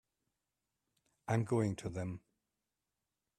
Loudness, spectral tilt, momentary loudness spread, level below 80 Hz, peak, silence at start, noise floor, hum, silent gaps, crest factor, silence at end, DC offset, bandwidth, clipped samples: -38 LUFS; -7.5 dB/octave; 16 LU; -70 dBFS; -20 dBFS; 1.25 s; -89 dBFS; none; none; 20 dB; 1.2 s; under 0.1%; 12.5 kHz; under 0.1%